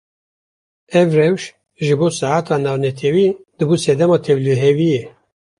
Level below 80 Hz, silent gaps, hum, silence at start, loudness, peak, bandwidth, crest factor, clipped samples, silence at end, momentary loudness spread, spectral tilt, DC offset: -58 dBFS; none; none; 0.9 s; -16 LUFS; -2 dBFS; 11.5 kHz; 14 dB; under 0.1%; 0.5 s; 7 LU; -6.5 dB/octave; under 0.1%